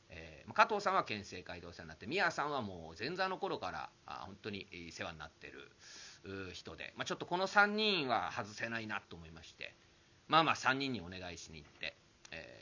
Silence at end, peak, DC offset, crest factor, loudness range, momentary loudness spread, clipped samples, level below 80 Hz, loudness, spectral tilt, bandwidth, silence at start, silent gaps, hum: 0 s; -12 dBFS; under 0.1%; 26 dB; 10 LU; 20 LU; under 0.1%; -66 dBFS; -37 LUFS; -4 dB/octave; 7.6 kHz; 0.1 s; none; none